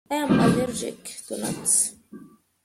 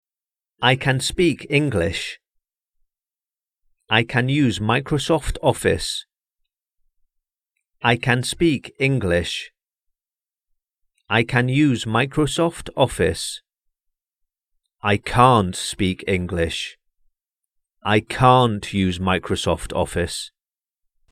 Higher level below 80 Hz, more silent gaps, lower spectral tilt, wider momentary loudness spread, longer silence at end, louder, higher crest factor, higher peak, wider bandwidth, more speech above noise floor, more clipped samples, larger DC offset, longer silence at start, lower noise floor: second, -56 dBFS vs -42 dBFS; neither; about the same, -4 dB/octave vs -5 dB/octave; first, 14 LU vs 11 LU; second, 0.4 s vs 0.85 s; second, -23 LUFS vs -20 LUFS; about the same, 18 dB vs 22 dB; second, -8 dBFS vs 0 dBFS; first, 16 kHz vs 14.5 kHz; second, 24 dB vs over 70 dB; neither; neither; second, 0.1 s vs 0.6 s; second, -47 dBFS vs under -90 dBFS